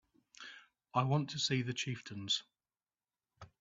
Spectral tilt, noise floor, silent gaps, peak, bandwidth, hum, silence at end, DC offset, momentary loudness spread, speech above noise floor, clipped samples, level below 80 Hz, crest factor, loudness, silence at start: -4.5 dB/octave; under -90 dBFS; none; -18 dBFS; 7.8 kHz; none; 0.15 s; under 0.1%; 18 LU; over 54 dB; under 0.1%; -76 dBFS; 22 dB; -36 LUFS; 0.4 s